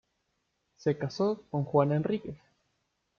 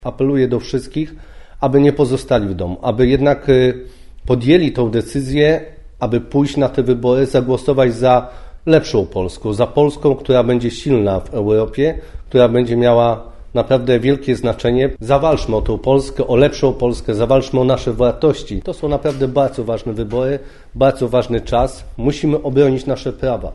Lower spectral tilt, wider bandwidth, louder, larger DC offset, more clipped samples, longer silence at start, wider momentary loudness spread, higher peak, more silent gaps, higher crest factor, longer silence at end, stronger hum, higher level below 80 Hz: about the same, -8 dB/octave vs -7 dB/octave; second, 7 kHz vs 11.5 kHz; second, -30 LUFS vs -16 LUFS; neither; neither; first, 0.8 s vs 0 s; about the same, 11 LU vs 9 LU; second, -12 dBFS vs 0 dBFS; neither; about the same, 20 dB vs 16 dB; first, 0.85 s vs 0 s; neither; second, -68 dBFS vs -32 dBFS